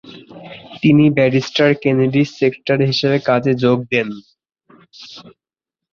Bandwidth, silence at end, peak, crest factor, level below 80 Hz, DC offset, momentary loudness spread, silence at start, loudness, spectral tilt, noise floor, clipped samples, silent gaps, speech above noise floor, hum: 7.2 kHz; 0.7 s; -2 dBFS; 16 dB; -56 dBFS; under 0.1%; 23 LU; 0.05 s; -15 LUFS; -7 dB/octave; -86 dBFS; under 0.1%; none; 71 dB; none